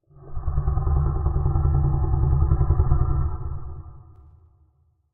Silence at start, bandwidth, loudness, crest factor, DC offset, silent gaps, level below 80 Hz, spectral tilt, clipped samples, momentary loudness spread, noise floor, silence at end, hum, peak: 0.2 s; 2 kHz; -24 LUFS; 16 dB; under 0.1%; none; -26 dBFS; -15 dB/octave; under 0.1%; 15 LU; -63 dBFS; 1.15 s; none; -6 dBFS